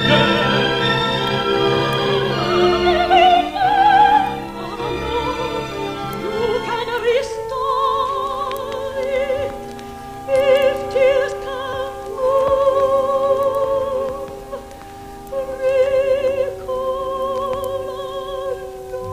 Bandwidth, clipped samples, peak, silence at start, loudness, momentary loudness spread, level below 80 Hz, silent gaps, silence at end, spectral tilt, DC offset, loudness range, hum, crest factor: 15.5 kHz; under 0.1%; 0 dBFS; 0 s; -18 LUFS; 13 LU; -42 dBFS; none; 0 s; -5 dB/octave; under 0.1%; 6 LU; none; 18 dB